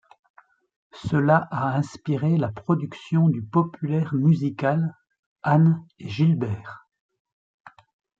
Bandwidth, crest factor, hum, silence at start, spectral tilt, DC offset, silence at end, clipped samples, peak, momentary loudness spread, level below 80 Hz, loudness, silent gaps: 7.4 kHz; 20 dB; none; 0.95 s; -9 dB/octave; under 0.1%; 0.5 s; under 0.1%; -4 dBFS; 11 LU; -62 dBFS; -23 LUFS; 5.19-5.36 s, 7.00-7.09 s, 7.20-7.25 s, 7.32-7.64 s